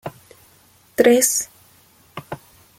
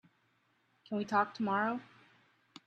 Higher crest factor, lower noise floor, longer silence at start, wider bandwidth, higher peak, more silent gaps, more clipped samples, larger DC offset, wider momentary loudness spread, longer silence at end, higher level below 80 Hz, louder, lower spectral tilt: about the same, 22 dB vs 22 dB; second, -54 dBFS vs -74 dBFS; second, 0.05 s vs 0.9 s; first, 16.5 kHz vs 8.6 kHz; first, 0 dBFS vs -16 dBFS; neither; neither; neither; first, 24 LU vs 9 LU; second, 0.4 s vs 0.8 s; first, -60 dBFS vs -82 dBFS; first, -17 LUFS vs -34 LUFS; second, -2.5 dB/octave vs -6.5 dB/octave